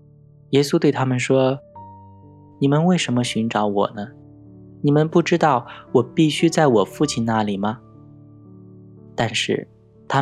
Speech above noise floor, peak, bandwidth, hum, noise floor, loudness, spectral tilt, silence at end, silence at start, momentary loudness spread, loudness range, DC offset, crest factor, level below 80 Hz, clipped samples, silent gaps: 30 dB; -2 dBFS; 13 kHz; none; -49 dBFS; -20 LUFS; -5.5 dB/octave; 0 s; 0.5 s; 8 LU; 4 LU; under 0.1%; 18 dB; -58 dBFS; under 0.1%; none